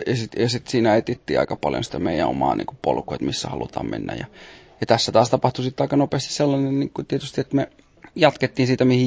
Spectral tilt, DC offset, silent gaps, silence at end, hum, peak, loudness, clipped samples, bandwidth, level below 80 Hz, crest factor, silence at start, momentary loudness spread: -5.5 dB/octave; under 0.1%; none; 0 s; none; -2 dBFS; -22 LUFS; under 0.1%; 8 kHz; -48 dBFS; 20 dB; 0 s; 10 LU